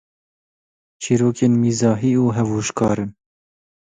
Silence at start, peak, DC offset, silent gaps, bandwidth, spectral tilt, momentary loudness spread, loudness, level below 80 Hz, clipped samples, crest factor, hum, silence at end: 1 s; -4 dBFS; under 0.1%; none; 9.4 kHz; -6.5 dB/octave; 7 LU; -18 LUFS; -52 dBFS; under 0.1%; 16 dB; none; 0.85 s